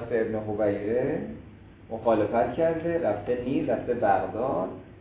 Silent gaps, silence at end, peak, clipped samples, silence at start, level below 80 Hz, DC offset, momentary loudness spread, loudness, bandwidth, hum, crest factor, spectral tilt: none; 0 s; -10 dBFS; under 0.1%; 0 s; -52 dBFS; under 0.1%; 8 LU; -27 LUFS; 4 kHz; none; 16 dB; -11 dB/octave